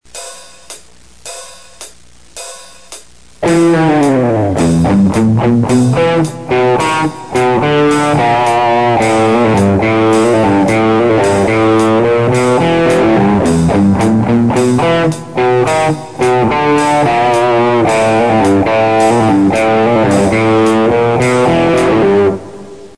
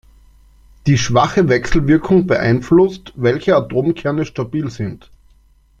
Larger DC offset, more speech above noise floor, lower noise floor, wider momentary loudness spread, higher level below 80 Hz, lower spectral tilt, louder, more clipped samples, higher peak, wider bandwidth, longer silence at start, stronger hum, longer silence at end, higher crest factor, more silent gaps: first, 1% vs under 0.1%; second, 32 dB vs 36 dB; second, -41 dBFS vs -51 dBFS; second, 6 LU vs 9 LU; about the same, -38 dBFS vs -36 dBFS; about the same, -6 dB/octave vs -6.5 dB/octave; first, -10 LUFS vs -16 LUFS; neither; about the same, 0 dBFS vs -2 dBFS; first, 11 kHz vs 7.8 kHz; second, 0.15 s vs 0.85 s; neither; second, 0.1 s vs 0.85 s; about the same, 10 dB vs 14 dB; neither